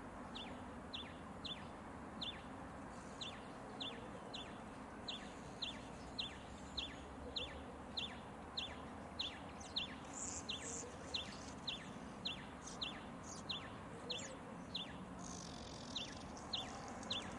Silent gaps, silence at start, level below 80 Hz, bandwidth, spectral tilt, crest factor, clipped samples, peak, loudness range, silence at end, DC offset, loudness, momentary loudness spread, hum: none; 0 s; -64 dBFS; 12 kHz; -3 dB/octave; 18 dB; under 0.1%; -30 dBFS; 4 LU; 0 s; under 0.1%; -48 LUFS; 7 LU; none